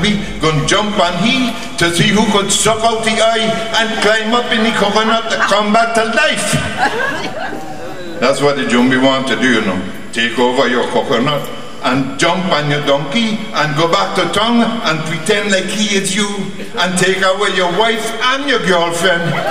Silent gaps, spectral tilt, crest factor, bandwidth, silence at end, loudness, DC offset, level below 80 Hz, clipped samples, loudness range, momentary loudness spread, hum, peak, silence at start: none; -3.5 dB/octave; 14 dB; 16 kHz; 0 s; -13 LUFS; 5%; -42 dBFS; under 0.1%; 2 LU; 6 LU; none; 0 dBFS; 0 s